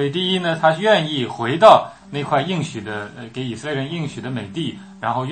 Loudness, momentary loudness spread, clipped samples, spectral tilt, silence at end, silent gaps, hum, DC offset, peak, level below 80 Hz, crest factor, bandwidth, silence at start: -19 LUFS; 16 LU; under 0.1%; -5.5 dB/octave; 0 s; none; none; under 0.1%; 0 dBFS; -58 dBFS; 20 dB; 8.8 kHz; 0 s